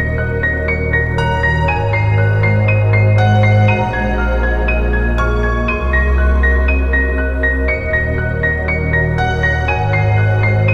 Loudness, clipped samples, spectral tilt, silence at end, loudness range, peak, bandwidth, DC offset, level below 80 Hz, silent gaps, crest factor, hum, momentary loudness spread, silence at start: -14 LUFS; under 0.1%; -8 dB/octave; 0 s; 2 LU; -2 dBFS; 6.6 kHz; under 0.1%; -18 dBFS; none; 12 dB; none; 5 LU; 0 s